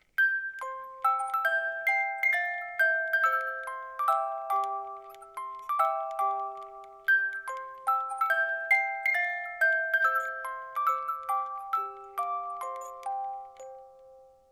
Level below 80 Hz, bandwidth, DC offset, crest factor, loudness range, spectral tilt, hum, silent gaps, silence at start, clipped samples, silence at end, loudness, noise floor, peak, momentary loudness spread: -76 dBFS; 16 kHz; under 0.1%; 16 dB; 6 LU; 0 dB/octave; none; none; 0.2 s; under 0.1%; 0.3 s; -29 LUFS; -55 dBFS; -14 dBFS; 13 LU